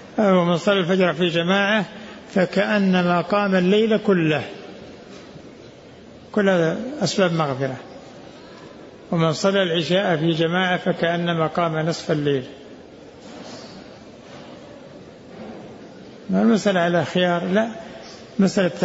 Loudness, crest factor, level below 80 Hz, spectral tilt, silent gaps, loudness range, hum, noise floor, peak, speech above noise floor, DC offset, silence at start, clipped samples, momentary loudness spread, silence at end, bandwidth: -20 LUFS; 16 dB; -60 dBFS; -6 dB/octave; none; 9 LU; none; -43 dBFS; -6 dBFS; 24 dB; under 0.1%; 0 s; under 0.1%; 23 LU; 0 s; 8 kHz